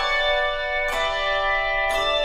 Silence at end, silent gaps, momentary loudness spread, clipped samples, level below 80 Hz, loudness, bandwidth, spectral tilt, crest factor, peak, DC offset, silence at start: 0 s; none; 3 LU; under 0.1%; -38 dBFS; -22 LUFS; 15.5 kHz; -1.5 dB/octave; 12 dB; -10 dBFS; under 0.1%; 0 s